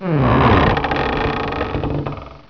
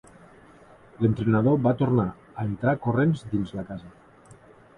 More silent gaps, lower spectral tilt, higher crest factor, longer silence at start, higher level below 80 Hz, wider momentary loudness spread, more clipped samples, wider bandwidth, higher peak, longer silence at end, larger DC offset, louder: neither; about the same, -8.5 dB/octave vs -9.5 dB/octave; about the same, 16 dB vs 18 dB; second, 0 s vs 1 s; first, -28 dBFS vs -52 dBFS; about the same, 10 LU vs 12 LU; neither; second, 5.4 kHz vs 10 kHz; first, -2 dBFS vs -8 dBFS; second, 0.1 s vs 0.45 s; first, 0.3% vs under 0.1%; first, -17 LUFS vs -25 LUFS